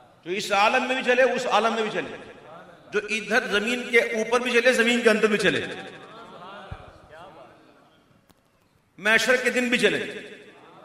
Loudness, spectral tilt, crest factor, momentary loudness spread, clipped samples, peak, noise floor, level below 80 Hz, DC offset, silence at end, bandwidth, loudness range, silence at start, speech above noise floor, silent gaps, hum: -22 LUFS; -3 dB/octave; 20 dB; 22 LU; under 0.1%; -6 dBFS; -63 dBFS; -60 dBFS; under 0.1%; 0.35 s; 16 kHz; 7 LU; 0.25 s; 41 dB; none; none